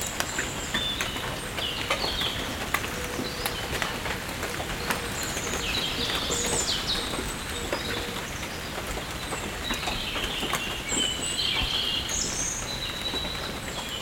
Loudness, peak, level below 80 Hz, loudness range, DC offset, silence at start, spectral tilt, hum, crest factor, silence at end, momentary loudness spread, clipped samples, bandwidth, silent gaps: -28 LUFS; -4 dBFS; -42 dBFS; 3 LU; under 0.1%; 0 s; -2 dB/octave; none; 26 dB; 0 s; 7 LU; under 0.1%; 18 kHz; none